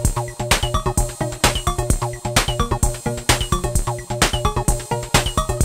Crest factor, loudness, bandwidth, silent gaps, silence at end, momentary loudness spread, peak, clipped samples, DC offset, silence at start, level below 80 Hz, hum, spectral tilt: 20 dB; -20 LUFS; 16.5 kHz; none; 0 s; 5 LU; 0 dBFS; under 0.1%; under 0.1%; 0 s; -26 dBFS; none; -3.5 dB/octave